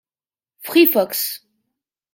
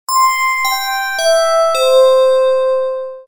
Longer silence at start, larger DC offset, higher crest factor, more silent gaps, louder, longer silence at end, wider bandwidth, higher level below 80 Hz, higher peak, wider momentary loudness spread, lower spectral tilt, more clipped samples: first, 0.6 s vs 0.1 s; neither; first, 18 dB vs 12 dB; neither; second, -17 LUFS vs -12 LUFS; first, 0.75 s vs 0.05 s; second, 17 kHz vs over 20 kHz; second, -74 dBFS vs -56 dBFS; about the same, -2 dBFS vs -2 dBFS; first, 21 LU vs 7 LU; first, -3 dB/octave vs 2 dB/octave; neither